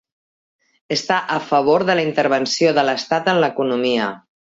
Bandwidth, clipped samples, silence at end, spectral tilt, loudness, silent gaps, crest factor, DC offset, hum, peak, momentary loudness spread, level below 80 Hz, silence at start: 7.8 kHz; under 0.1%; 0.35 s; -4.5 dB/octave; -18 LUFS; none; 16 dB; under 0.1%; none; -2 dBFS; 5 LU; -64 dBFS; 0.9 s